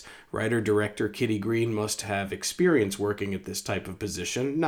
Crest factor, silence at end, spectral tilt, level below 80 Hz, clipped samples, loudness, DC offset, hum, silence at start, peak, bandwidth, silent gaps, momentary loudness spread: 16 dB; 0 s; -4.5 dB/octave; -60 dBFS; under 0.1%; -28 LUFS; under 0.1%; none; 0 s; -12 dBFS; 19.5 kHz; none; 9 LU